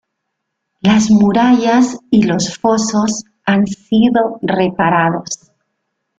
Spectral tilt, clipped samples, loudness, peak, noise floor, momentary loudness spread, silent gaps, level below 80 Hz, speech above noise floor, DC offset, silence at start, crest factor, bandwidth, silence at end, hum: -5 dB/octave; under 0.1%; -13 LUFS; 0 dBFS; -74 dBFS; 8 LU; none; -50 dBFS; 61 dB; under 0.1%; 0.85 s; 14 dB; 9 kHz; 0.85 s; none